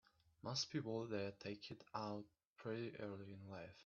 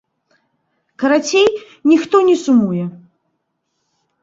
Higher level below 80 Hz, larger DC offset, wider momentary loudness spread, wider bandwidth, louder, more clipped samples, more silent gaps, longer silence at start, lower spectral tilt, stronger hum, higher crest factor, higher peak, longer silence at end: second, -82 dBFS vs -60 dBFS; neither; first, 11 LU vs 8 LU; about the same, 7.2 kHz vs 7.8 kHz; second, -48 LUFS vs -14 LUFS; neither; first, 2.45-2.56 s vs none; second, 0.45 s vs 1 s; about the same, -4.5 dB/octave vs -5 dB/octave; neither; first, 20 dB vs 14 dB; second, -30 dBFS vs -2 dBFS; second, 0 s vs 1.25 s